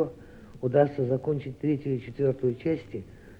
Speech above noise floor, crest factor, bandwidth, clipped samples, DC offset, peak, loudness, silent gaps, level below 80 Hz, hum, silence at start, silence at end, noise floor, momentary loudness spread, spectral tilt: 20 dB; 20 dB; 6.8 kHz; under 0.1%; under 0.1%; -8 dBFS; -28 LUFS; none; -56 dBFS; none; 0 s; 0.05 s; -47 dBFS; 11 LU; -10 dB/octave